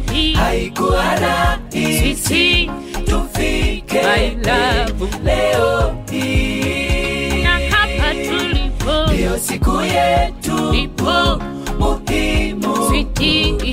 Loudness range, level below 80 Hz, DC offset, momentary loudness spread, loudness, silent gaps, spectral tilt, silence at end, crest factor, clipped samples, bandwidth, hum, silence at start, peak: 1 LU; -22 dBFS; under 0.1%; 5 LU; -16 LUFS; none; -4.5 dB/octave; 0 s; 12 dB; under 0.1%; 16 kHz; none; 0 s; -4 dBFS